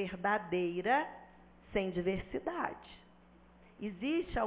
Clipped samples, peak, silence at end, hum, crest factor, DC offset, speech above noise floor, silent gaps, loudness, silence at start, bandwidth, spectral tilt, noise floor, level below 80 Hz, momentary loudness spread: under 0.1%; -18 dBFS; 0 s; none; 20 dB; under 0.1%; 26 dB; none; -36 LUFS; 0 s; 4 kHz; -4 dB/octave; -62 dBFS; -56 dBFS; 13 LU